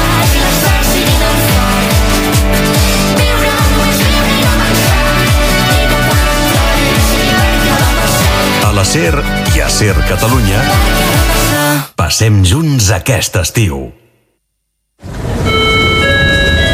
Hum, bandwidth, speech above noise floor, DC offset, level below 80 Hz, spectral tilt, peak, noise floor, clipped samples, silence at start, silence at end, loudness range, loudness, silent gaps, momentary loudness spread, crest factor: none; 16 kHz; 57 dB; under 0.1%; -16 dBFS; -4 dB/octave; 0 dBFS; -67 dBFS; under 0.1%; 0 s; 0 s; 3 LU; -10 LUFS; none; 4 LU; 10 dB